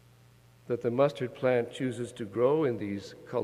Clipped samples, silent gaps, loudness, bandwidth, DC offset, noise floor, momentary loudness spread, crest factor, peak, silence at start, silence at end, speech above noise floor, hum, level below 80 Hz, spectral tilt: under 0.1%; none; -30 LUFS; 12.5 kHz; under 0.1%; -58 dBFS; 10 LU; 18 dB; -12 dBFS; 0.65 s; 0 s; 29 dB; none; -70 dBFS; -7 dB/octave